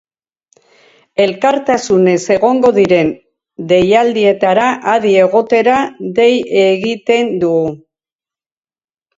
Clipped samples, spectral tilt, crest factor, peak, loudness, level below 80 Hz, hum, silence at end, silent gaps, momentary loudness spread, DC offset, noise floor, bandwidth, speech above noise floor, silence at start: under 0.1%; -5.5 dB/octave; 12 dB; 0 dBFS; -12 LUFS; -52 dBFS; none; 1.4 s; none; 6 LU; under 0.1%; under -90 dBFS; 8 kHz; over 79 dB; 1.2 s